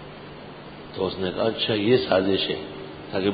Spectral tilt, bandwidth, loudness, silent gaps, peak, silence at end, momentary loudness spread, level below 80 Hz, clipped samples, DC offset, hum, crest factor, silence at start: -10 dB/octave; 5 kHz; -24 LUFS; none; -6 dBFS; 0 s; 20 LU; -52 dBFS; under 0.1%; under 0.1%; none; 20 dB; 0 s